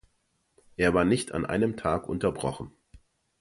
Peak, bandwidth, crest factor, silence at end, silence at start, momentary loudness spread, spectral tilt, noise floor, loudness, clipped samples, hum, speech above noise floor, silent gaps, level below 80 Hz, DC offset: -8 dBFS; 11.5 kHz; 20 dB; 0.45 s; 0.8 s; 16 LU; -6 dB/octave; -73 dBFS; -27 LUFS; under 0.1%; none; 46 dB; none; -50 dBFS; under 0.1%